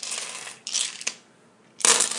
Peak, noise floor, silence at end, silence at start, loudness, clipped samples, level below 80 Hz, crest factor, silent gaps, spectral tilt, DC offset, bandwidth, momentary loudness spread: 0 dBFS; -56 dBFS; 0 s; 0 s; -24 LUFS; under 0.1%; -78 dBFS; 26 dB; none; 2 dB/octave; under 0.1%; 11.5 kHz; 15 LU